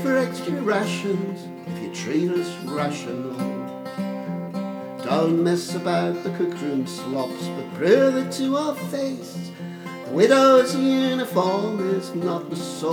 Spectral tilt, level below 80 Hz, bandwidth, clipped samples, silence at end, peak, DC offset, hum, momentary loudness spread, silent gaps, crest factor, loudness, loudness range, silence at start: -5.5 dB/octave; -74 dBFS; 18 kHz; under 0.1%; 0 s; -4 dBFS; under 0.1%; none; 14 LU; none; 18 dB; -23 LUFS; 7 LU; 0 s